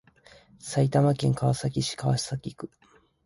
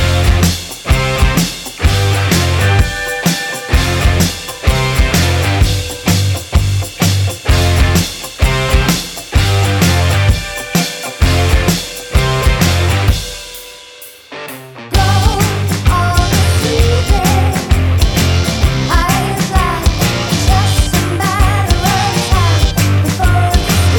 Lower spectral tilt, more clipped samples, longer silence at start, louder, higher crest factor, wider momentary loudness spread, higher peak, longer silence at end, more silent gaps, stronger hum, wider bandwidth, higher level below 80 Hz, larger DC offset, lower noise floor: first, -6 dB/octave vs -4.5 dB/octave; neither; first, 0.65 s vs 0 s; second, -26 LUFS vs -13 LUFS; first, 18 dB vs 12 dB; first, 19 LU vs 6 LU; second, -10 dBFS vs 0 dBFS; first, 0.6 s vs 0 s; neither; neither; second, 11.5 kHz vs over 20 kHz; second, -56 dBFS vs -18 dBFS; neither; first, -56 dBFS vs -35 dBFS